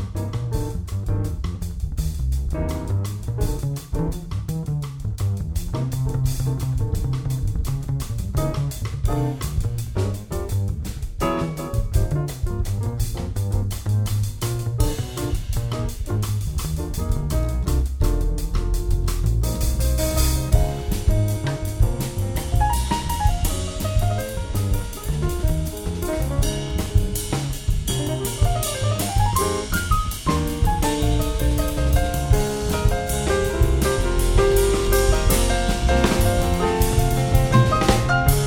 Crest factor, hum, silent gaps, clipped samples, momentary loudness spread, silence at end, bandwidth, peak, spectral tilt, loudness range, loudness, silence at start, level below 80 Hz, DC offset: 18 dB; none; none; under 0.1%; 8 LU; 0 s; 20 kHz; -2 dBFS; -5.5 dB/octave; 6 LU; -23 LUFS; 0 s; -24 dBFS; under 0.1%